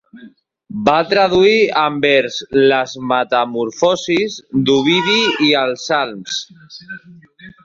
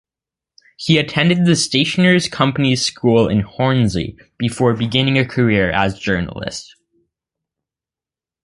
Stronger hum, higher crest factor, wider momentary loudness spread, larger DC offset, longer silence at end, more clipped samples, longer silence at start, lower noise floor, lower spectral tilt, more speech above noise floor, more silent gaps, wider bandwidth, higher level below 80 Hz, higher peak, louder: neither; about the same, 16 dB vs 16 dB; about the same, 12 LU vs 11 LU; neither; second, 0.15 s vs 1.8 s; neither; second, 0.15 s vs 0.8 s; second, -41 dBFS vs -89 dBFS; about the same, -4 dB/octave vs -5 dB/octave; second, 26 dB vs 73 dB; neither; second, 7.6 kHz vs 11.5 kHz; second, -54 dBFS vs -42 dBFS; about the same, 0 dBFS vs 0 dBFS; about the same, -15 LUFS vs -16 LUFS